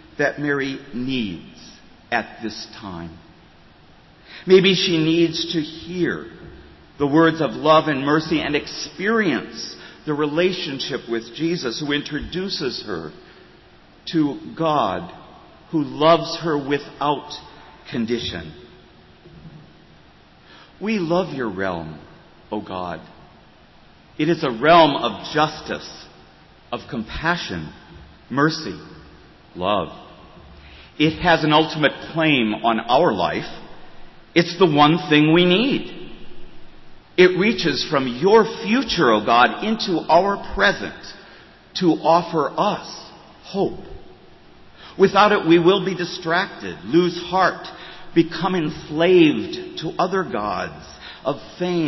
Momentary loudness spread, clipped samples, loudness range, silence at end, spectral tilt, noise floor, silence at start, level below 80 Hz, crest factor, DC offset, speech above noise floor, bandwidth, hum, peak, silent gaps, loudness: 18 LU; under 0.1%; 9 LU; 0 s; -5.5 dB/octave; -49 dBFS; 0.2 s; -50 dBFS; 18 dB; under 0.1%; 30 dB; 6.2 kHz; none; -2 dBFS; none; -20 LUFS